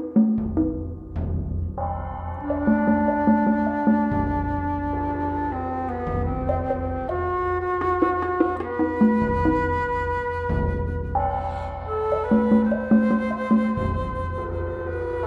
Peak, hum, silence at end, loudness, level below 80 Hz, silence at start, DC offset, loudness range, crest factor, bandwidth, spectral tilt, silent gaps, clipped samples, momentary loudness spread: -6 dBFS; none; 0 s; -24 LUFS; -36 dBFS; 0 s; under 0.1%; 3 LU; 16 dB; 4.9 kHz; -10 dB/octave; none; under 0.1%; 9 LU